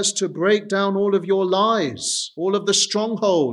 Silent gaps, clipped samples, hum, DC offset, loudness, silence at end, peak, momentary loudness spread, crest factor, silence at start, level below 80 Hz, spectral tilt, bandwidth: none; under 0.1%; none; under 0.1%; -20 LUFS; 0 s; -6 dBFS; 5 LU; 14 dB; 0 s; -74 dBFS; -3 dB/octave; 12 kHz